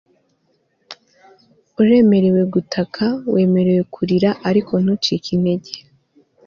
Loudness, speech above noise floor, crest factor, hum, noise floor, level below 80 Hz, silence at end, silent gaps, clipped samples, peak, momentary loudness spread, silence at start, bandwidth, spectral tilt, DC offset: -17 LUFS; 48 dB; 14 dB; none; -64 dBFS; -56 dBFS; 0.65 s; none; under 0.1%; -4 dBFS; 10 LU; 0.9 s; 7 kHz; -7.5 dB/octave; under 0.1%